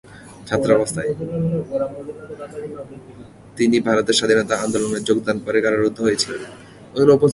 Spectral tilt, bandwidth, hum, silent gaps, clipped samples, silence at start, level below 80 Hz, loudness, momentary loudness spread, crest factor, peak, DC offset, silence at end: -4.5 dB/octave; 11.5 kHz; none; none; under 0.1%; 0.1 s; -52 dBFS; -19 LUFS; 18 LU; 18 dB; -2 dBFS; under 0.1%; 0 s